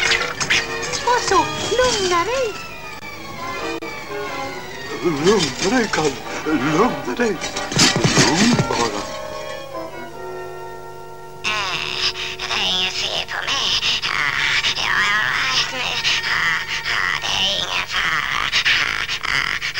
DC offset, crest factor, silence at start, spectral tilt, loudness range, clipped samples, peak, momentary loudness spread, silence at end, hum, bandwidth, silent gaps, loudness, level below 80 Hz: 1%; 20 dB; 0 s; -2.5 dB/octave; 6 LU; under 0.1%; 0 dBFS; 15 LU; 0 s; none; 16.5 kHz; none; -18 LUFS; -44 dBFS